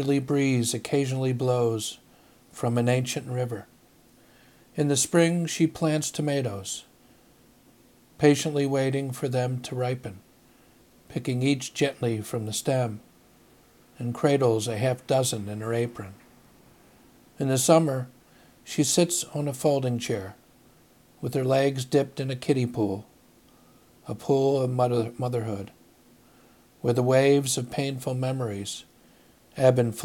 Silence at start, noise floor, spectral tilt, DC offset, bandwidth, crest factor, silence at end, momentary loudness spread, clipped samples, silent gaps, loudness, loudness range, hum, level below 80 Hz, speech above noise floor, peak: 0 s; -58 dBFS; -5 dB/octave; under 0.1%; 17 kHz; 20 dB; 0 s; 14 LU; under 0.1%; none; -26 LUFS; 4 LU; none; -66 dBFS; 32 dB; -6 dBFS